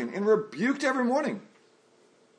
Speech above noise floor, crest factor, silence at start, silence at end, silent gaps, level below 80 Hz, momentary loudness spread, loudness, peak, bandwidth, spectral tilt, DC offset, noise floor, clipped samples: 35 dB; 16 dB; 0 s; 0.95 s; none; -86 dBFS; 7 LU; -27 LUFS; -14 dBFS; 10 kHz; -5.5 dB/octave; under 0.1%; -62 dBFS; under 0.1%